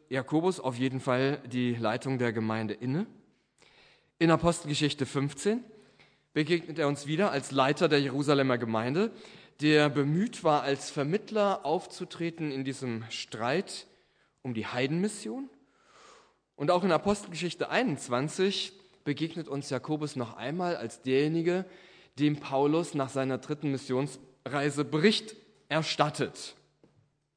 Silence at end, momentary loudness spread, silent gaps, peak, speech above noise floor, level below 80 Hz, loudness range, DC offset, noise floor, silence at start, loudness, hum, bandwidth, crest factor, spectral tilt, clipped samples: 0.85 s; 10 LU; none; -8 dBFS; 39 dB; -66 dBFS; 6 LU; under 0.1%; -68 dBFS; 0.1 s; -30 LUFS; none; 10.5 kHz; 22 dB; -5.5 dB/octave; under 0.1%